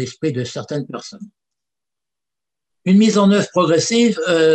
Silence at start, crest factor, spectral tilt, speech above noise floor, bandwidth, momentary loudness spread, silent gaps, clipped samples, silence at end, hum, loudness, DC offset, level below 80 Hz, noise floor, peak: 0 s; 14 dB; -5 dB/octave; 71 dB; 9 kHz; 15 LU; none; under 0.1%; 0 s; none; -16 LUFS; under 0.1%; -64 dBFS; -87 dBFS; -4 dBFS